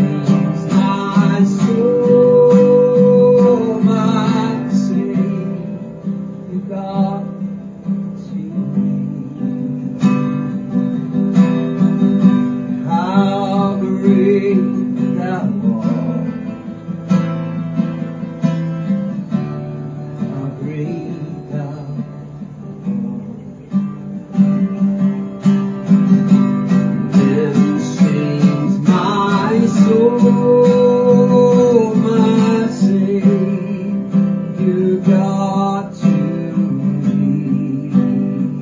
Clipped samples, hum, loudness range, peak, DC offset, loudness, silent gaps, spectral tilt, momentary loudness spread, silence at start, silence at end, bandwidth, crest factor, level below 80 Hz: under 0.1%; none; 11 LU; 0 dBFS; under 0.1%; -15 LUFS; none; -8.5 dB/octave; 14 LU; 0 s; 0 s; 7.6 kHz; 14 dB; -52 dBFS